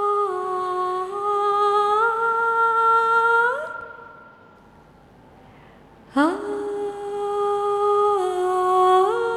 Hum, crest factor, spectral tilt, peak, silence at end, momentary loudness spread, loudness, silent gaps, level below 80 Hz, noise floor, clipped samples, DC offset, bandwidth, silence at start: none; 14 dB; -4.5 dB/octave; -8 dBFS; 0 s; 11 LU; -20 LUFS; none; -62 dBFS; -50 dBFS; under 0.1%; under 0.1%; 13 kHz; 0 s